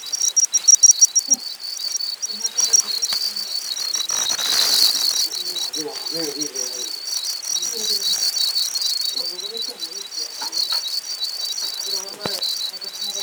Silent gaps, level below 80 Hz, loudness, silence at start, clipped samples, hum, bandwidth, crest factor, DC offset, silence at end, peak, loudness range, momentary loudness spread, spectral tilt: none; -74 dBFS; -18 LUFS; 0 s; under 0.1%; none; over 20 kHz; 20 dB; under 0.1%; 0 s; -2 dBFS; 8 LU; 12 LU; 2 dB/octave